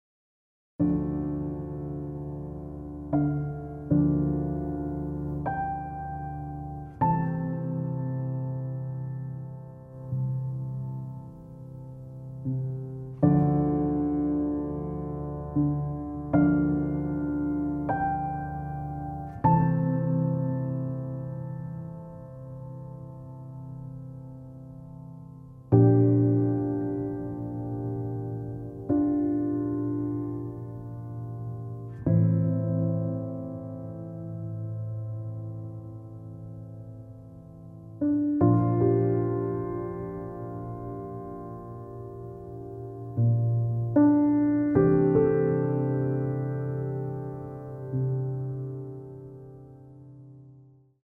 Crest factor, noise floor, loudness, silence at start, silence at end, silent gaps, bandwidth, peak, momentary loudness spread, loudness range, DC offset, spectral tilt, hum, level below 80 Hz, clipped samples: 22 dB; -55 dBFS; -28 LUFS; 0.8 s; 0.4 s; none; 2.8 kHz; -6 dBFS; 20 LU; 11 LU; under 0.1%; -13 dB/octave; none; -48 dBFS; under 0.1%